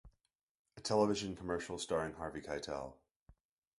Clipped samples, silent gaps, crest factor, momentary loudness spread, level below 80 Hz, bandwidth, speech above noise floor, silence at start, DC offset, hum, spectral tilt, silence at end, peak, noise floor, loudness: under 0.1%; 0.35-0.65 s, 3.11-3.26 s; 22 dB; 12 LU; -62 dBFS; 11.5 kHz; 46 dB; 0.05 s; under 0.1%; none; -4.5 dB/octave; 0.5 s; -18 dBFS; -84 dBFS; -39 LUFS